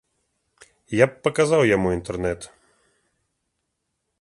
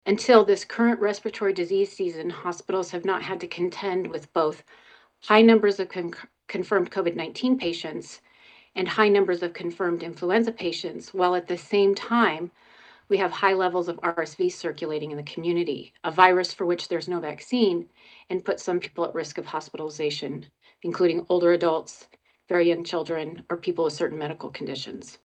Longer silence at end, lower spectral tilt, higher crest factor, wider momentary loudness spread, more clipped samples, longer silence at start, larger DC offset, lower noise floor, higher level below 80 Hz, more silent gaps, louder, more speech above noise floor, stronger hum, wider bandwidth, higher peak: first, 1.75 s vs 0.15 s; about the same, -5.5 dB/octave vs -5 dB/octave; about the same, 22 dB vs 24 dB; second, 11 LU vs 14 LU; neither; first, 0.9 s vs 0.05 s; neither; first, -77 dBFS vs -54 dBFS; first, -48 dBFS vs -72 dBFS; neither; first, -21 LUFS vs -25 LUFS; first, 57 dB vs 30 dB; neither; first, 11.5 kHz vs 9 kHz; about the same, -2 dBFS vs -2 dBFS